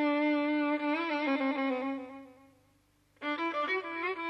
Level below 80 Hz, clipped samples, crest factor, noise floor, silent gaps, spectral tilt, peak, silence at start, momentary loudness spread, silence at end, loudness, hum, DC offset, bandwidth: -78 dBFS; under 0.1%; 12 dB; -69 dBFS; none; -5 dB/octave; -20 dBFS; 0 s; 11 LU; 0 s; -32 LUFS; 50 Hz at -75 dBFS; under 0.1%; 6 kHz